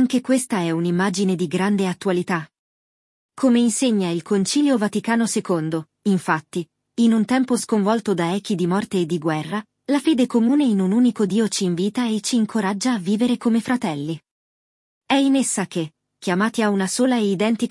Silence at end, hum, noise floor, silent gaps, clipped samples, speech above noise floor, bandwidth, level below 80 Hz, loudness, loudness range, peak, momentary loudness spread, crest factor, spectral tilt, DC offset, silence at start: 0 s; none; under -90 dBFS; 2.59-3.29 s, 14.31-15.01 s; under 0.1%; over 70 dB; 12 kHz; -68 dBFS; -21 LUFS; 3 LU; -4 dBFS; 8 LU; 16 dB; -5 dB/octave; under 0.1%; 0 s